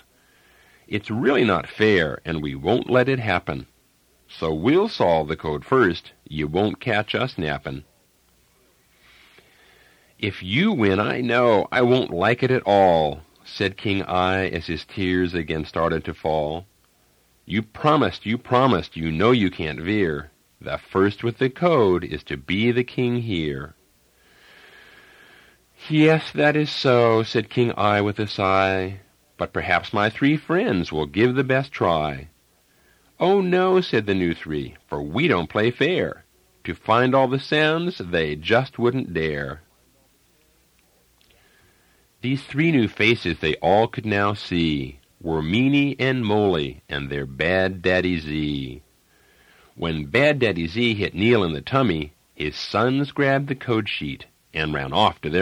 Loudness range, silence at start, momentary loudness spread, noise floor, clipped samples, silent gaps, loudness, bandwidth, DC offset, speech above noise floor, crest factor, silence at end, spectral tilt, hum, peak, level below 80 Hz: 6 LU; 0.9 s; 12 LU; -61 dBFS; under 0.1%; none; -21 LUFS; 12.5 kHz; under 0.1%; 40 dB; 20 dB; 0 s; -7 dB/octave; none; -4 dBFS; -48 dBFS